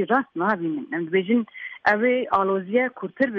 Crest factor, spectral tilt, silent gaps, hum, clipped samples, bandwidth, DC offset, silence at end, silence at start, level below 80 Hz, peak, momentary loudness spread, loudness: 16 dB; -8 dB/octave; none; none; under 0.1%; 6.2 kHz; under 0.1%; 0 s; 0 s; -66 dBFS; -6 dBFS; 7 LU; -23 LUFS